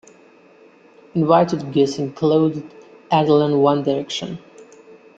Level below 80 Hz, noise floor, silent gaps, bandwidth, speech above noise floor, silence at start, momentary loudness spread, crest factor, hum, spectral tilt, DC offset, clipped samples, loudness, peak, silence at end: -62 dBFS; -49 dBFS; none; 8 kHz; 32 dB; 1.15 s; 12 LU; 18 dB; none; -6.5 dB/octave; under 0.1%; under 0.1%; -18 LUFS; -2 dBFS; 0.55 s